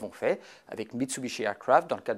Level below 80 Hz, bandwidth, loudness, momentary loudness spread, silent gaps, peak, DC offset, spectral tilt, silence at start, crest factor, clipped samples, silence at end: -74 dBFS; 16 kHz; -29 LUFS; 14 LU; none; -8 dBFS; under 0.1%; -4 dB/octave; 0 s; 22 dB; under 0.1%; 0 s